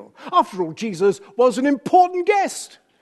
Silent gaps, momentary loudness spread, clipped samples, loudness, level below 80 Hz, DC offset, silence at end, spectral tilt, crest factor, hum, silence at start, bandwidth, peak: none; 10 LU; under 0.1%; -19 LUFS; -74 dBFS; under 0.1%; 0.35 s; -4.5 dB/octave; 16 dB; none; 0 s; 12.5 kHz; -4 dBFS